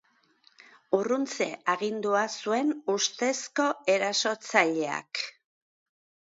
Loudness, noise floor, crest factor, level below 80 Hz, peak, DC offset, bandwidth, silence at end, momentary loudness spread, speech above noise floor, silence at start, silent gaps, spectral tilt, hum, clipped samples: -28 LUFS; -64 dBFS; 24 dB; -82 dBFS; -6 dBFS; under 0.1%; 8 kHz; 1 s; 7 LU; 37 dB; 0.9 s; none; -2.5 dB/octave; none; under 0.1%